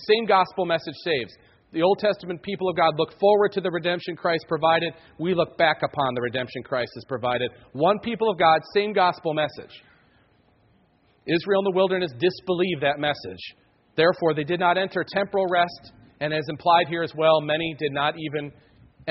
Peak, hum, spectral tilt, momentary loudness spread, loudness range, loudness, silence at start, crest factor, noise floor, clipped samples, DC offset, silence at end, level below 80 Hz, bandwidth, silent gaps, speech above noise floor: -6 dBFS; none; -3 dB/octave; 11 LU; 3 LU; -23 LUFS; 0 s; 18 dB; -62 dBFS; under 0.1%; under 0.1%; 0 s; -62 dBFS; 6 kHz; none; 39 dB